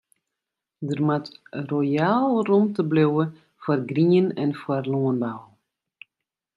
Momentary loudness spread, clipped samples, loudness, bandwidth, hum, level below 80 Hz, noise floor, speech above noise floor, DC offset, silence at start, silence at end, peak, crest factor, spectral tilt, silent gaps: 12 LU; under 0.1%; -23 LUFS; 7.6 kHz; none; -70 dBFS; -86 dBFS; 64 dB; under 0.1%; 0.8 s; 1.15 s; -8 dBFS; 16 dB; -9 dB/octave; none